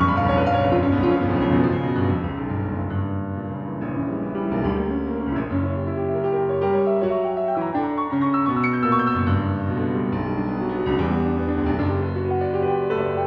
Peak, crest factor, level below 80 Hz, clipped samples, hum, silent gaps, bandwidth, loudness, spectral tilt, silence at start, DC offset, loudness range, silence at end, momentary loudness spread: -6 dBFS; 16 dB; -40 dBFS; under 0.1%; none; none; 5.6 kHz; -22 LUFS; -10 dB/octave; 0 s; under 0.1%; 4 LU; 0 s; 7 LU